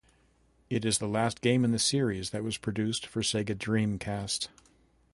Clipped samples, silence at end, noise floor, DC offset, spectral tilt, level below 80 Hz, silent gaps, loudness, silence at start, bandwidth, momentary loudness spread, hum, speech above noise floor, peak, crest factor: under 0.1%; 0.65 s; -66 dBFS; under 0.1%; -4.5 dB/octave; -56 dBFS; none; -30 LUFS; 0.7 s; 11.5 kHz; 8 LU; none; 36 dB; -12 dBFS; 18 dB